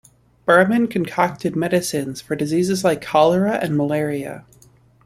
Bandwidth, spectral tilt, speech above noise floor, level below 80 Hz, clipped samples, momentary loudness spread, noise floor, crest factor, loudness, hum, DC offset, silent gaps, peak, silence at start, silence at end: 15 kHz; -5.5 dB/octave; 33 dB; -56 dBFS; under 0.1%; 11 LU; -52 dBFS; 18 dB; -19 LUFS; none; under 0.1%; none; -2 dBFS; 0.45 s; 0.65 s